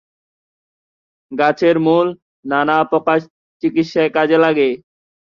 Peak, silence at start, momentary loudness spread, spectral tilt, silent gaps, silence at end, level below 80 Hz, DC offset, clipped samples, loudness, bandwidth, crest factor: -2 dBFS; 1.3 s; 9 LU; -7 dB/octave; 2.22-2.43 s, 3.30-3.60 s; 0.5 s; -62 dBFS; under 0.1%; under 0.1%; -16 LUFS; 7 kHz; 16 dB